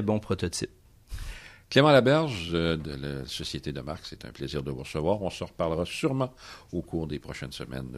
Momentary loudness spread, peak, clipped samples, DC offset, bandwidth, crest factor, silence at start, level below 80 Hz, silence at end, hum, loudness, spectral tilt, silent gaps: 19 LU; -6 dBFS; under 0.1%; under 0.1%; 14 kHz; 22 dB; 0 s; -48 dBFS; 0 s; none; -28 LUFS; -5.5 dB/octave; none